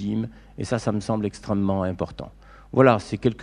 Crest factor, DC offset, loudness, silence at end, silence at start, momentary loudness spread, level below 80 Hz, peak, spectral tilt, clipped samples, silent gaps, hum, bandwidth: 22 dB; under 0.1%; -24 LUFS; 0 s; 0 s; 17 LU; -48 dBFS; -2 dBFS; -7 dB/octave; under 0.1%; none; none; 11 kHz